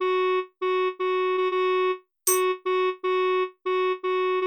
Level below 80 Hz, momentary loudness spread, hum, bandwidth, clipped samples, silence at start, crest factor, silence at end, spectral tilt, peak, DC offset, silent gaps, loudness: -84 dBFS; 3 LU; none; 19.5 kHz; under 0.1%; 0 s; 18 dB; 0 s; 0 dB/octave; -6 dBFS; under 0.1%; none; -25 LUFS